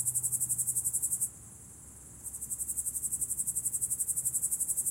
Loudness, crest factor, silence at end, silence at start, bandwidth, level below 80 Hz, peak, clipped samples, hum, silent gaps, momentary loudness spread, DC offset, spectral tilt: -30 LUFS; 20 dB; 0 s; 0 s; 16 kHz; -60 dBFS; -14 dBFS; under 0.1%; none; none; 19 LU; under 0.1%; -1.5 dB/octave